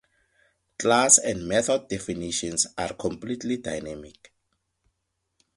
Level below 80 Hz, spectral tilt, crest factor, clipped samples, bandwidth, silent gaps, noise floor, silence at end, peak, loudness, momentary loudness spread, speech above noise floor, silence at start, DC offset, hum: -56 dBFS; -2.5 dB/octave; 28 dB; under 0.1%; 11.5 kHz; none; -78 dBFS; 1.45 s; 0 dBFS; -24 LUFS; 16 LU; 53 dB; 0.8 s; under 0.1%; none